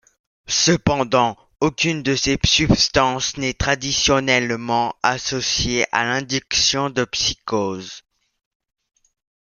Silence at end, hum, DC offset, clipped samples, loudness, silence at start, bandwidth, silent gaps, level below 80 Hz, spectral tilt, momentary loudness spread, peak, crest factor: 1.5 s; none; under 0.1%; under 0.1%; -19 LUFS; 0.5 s; 11 kHz; none; -40 dBFS; -3 dB/octave; 7 LU; 0 dBFS; 20 dB